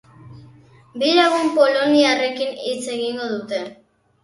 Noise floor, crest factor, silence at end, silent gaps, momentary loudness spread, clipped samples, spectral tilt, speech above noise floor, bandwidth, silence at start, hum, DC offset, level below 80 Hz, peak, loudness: -48 dBFS; 18 dB; 0.5 s; none; 13 LU; under 0.1%; -3.5 dB/octave; 30 dB; 11.5 kHz; 0.25 s; none; under 0.1%; -66 dBFS; -2 dBFS; -19 LUFS